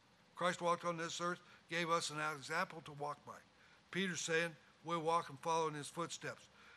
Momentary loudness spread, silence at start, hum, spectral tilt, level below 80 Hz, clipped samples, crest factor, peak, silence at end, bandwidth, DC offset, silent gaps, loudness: 12 LU; 0.35 s; none; -3.5 dB/octave; -84 dBFS; under 0.1%; 20 dB; -22 dBFS; 0 s; 14 kHz; under 0.1%; none; -41 LUFS